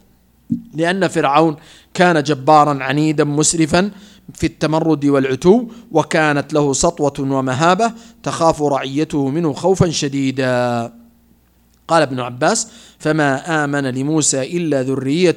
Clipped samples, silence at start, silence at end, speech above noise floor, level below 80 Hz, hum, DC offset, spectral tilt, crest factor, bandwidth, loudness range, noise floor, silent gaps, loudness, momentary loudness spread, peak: under 0.1%; 0.5 s; 0 s; 38 dB; -46 dBFS; none; under 0.1%; -4.5 dB/octave; 16 dB; 15.5 kHz; 4 LU; -54 dBFS; none; -16 LUFS; 7 LU; 0 dBFS